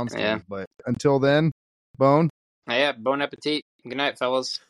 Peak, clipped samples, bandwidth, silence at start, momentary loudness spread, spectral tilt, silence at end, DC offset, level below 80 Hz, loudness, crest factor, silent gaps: -6 dBFS; under 0.1%; 12 kHz; 0 s; 11 LU; -6 dB/octave; 0.1 s; under 0.1%; -62 dBFS; -23 LUFS; 18 dB; 0.67-0.71 s, 1.52-1.94 s, 2.30-2.62 s, 3.62-3.79 s